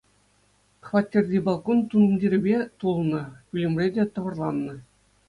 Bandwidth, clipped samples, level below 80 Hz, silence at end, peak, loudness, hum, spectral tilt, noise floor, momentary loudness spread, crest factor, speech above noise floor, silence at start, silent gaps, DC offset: 9.6 kHz; under 0.1%; -60 dBFS; 0.45 s; -8 dBFS; -24 LUFS; 50 Hz at -45 dBFS; -9 dB/octave; -64 dBFS; 10 LU; 16 dB; 40 dB; 0.85 s; none; under 0.1%